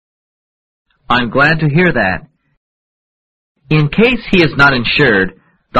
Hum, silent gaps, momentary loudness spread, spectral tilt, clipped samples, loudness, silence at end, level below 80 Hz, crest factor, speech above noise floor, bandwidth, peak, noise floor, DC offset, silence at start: none; 2.57-3.55 s; 7 LU; -7 dB/octave; under 0.1%; -11 LUFS; 0 s; -36 dBFS; 14 dB; over 79 dB; 7.8 kHz; 0 dBFS; under -90 dBFS; under 0.1%; 1.1 s